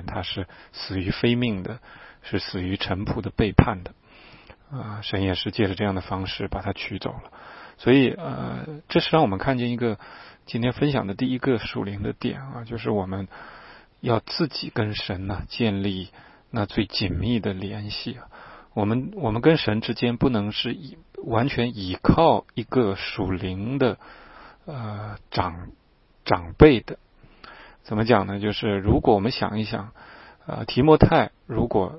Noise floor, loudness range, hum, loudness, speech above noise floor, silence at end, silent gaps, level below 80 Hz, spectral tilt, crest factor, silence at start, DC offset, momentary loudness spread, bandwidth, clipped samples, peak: -50 dBFS; 6 LU; none; -24 LUFS; 26 dB; 0 s; none; -40 dBFS; -10.5 dB/octave; 24 dB; 0 s; under 0.1%; 18 LU; 5.8 kHz; under 0.1%; 0 dBFS